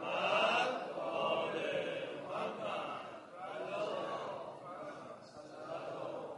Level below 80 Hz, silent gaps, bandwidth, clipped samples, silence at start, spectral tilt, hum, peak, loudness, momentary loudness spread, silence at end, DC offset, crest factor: -84 dBFS; none; 11.5 kHz; under 0.1%; 0 s; -4 dB/octave; none; -20 dBFS; -38 LUFS; 16 LU; 0 s; under 0.1%; 18 dB